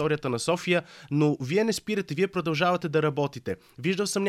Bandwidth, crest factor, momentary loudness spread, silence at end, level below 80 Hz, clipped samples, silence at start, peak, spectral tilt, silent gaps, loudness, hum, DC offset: 15 kHz; 16 dB; 6 LU; 0 s; -64 dBFS; under 0.1%; 0 s; -10 dBFS; -5 dB/octave; none; -27 LUFS; none; under 0.1%